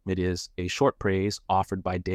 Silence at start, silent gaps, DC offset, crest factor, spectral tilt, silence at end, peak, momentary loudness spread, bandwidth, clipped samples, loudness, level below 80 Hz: 0.05 s; none; under 0.1%; 16 dB; -5.5 dB/octave; 0 s; -10 dBFS; 6 LU; 14.5 kHz; under 0.1%; -27 LUFS; -50 dBFS